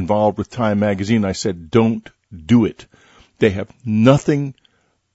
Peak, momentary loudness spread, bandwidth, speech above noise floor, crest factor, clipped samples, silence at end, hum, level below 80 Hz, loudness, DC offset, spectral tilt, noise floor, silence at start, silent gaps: 0 dBFS; 10 LU; 8 kHz; 44 dB; 18 dB; under 0.1%; 0.6 s; none; -48 dBFS; -18 LUFS; under 0.1%; -7 dB/octave; -61 dBFS; 0 s; none